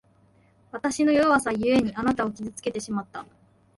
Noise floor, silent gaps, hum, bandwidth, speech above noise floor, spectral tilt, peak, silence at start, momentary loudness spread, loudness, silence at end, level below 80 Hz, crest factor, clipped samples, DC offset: -60 dBFS; none; none; 11.5 kHz; 36 dB; -5 dB/octave; -8 dBFS; 0.75 s; 14 LU; -24 LUFS; 0.55 s; -56 dBFS; 18 dB; under 0.1%; under 0.1%